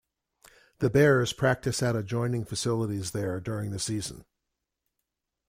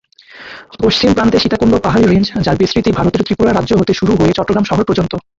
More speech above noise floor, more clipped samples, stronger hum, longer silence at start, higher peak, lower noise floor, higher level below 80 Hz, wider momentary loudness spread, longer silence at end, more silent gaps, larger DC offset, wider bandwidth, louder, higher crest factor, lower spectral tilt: first, 57 dB vs 24 dB; neither; neither; first, 0.8 s vs 0.35 s; second, -10 dBFS vs 0 dBFS; first, -84 dBFS vs -36 dBFS; second, -56 dBFS vs -34 dBFS; first, 10 LU vs 5 LU; first, 1.25 s vs 0.2 s; neither; neither; first, 16 kHz vs 7.8 kHz; second, -28 LUFS vs -12 LUFS; first, 20 dB vs 12 dB; about the same, -5.5 dB/octave vs -6.5 dB/octave